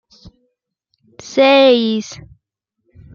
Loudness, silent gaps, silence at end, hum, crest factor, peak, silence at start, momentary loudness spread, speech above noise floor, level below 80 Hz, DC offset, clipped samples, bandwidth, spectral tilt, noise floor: -13 LUFS; none; 1 s; none; 16 dB; 0 dBFS; 1.25 s; 22 LU; 60 dB; -56 dBFS; under 0.1%; under 0.1%; 7.2 kHz; -4 dB/octave; -73 dBFS